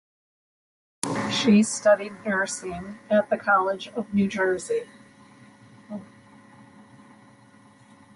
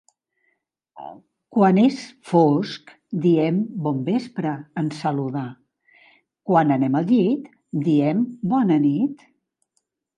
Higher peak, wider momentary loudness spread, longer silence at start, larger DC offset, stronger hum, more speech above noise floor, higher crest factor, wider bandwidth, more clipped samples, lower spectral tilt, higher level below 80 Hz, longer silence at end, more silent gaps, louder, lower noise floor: about the same, -2 dBFS vs -4 dBFS; first, 19 LU vs 15 LU; about the same, 1.05 s vs 0.95 s; neither; neither; second, 30 dB vs 54 dB; first, 24 dB vs 18 dB; first, 11.5 kHz vs 10 kHz; neither; second, -4.5 dB/octave vs -8.5 dB/octave; first, -64 dBFS vs -72 dBFS; first, 2.1 s vs 1 s; neither; second, -24 LUFS vs -21 LUFS; second, -53 dBFS vs -74 dBFS